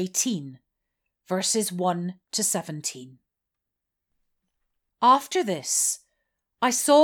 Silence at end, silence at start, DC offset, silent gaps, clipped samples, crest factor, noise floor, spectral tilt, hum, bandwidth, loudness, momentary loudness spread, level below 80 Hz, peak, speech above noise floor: 0 s; 0 s; under 0.1%; none; under 0.1%; 20 dB; -85 dBFS; -3 dB/octave; none; 18.5 kHz; -24 LUFS; 13 LU; -82 dBFS; -6 dBFS; 61 dB